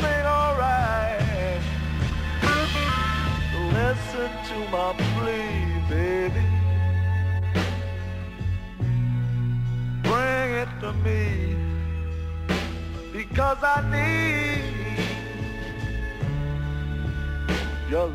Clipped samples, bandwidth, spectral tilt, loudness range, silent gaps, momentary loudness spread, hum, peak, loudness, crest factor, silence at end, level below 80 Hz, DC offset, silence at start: under 0.1%; 15 kHz; -6.5 dB/octave; 3 LU; none; 9 LU; none; -8 dBFS; -25 LUFS; 16 dB; 0 s; -32 dBFS; under 0.1%; 0 s